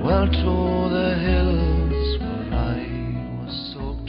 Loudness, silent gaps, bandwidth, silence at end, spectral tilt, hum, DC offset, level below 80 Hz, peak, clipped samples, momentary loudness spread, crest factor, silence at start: -23 LUFS; none; 5.4 kHz; 0 s; -11.5 dB/octave; none; under 0.1%; -26 dBFS; -6 dBFS; under 0.1%; 10 LU; 16 dB; 0 s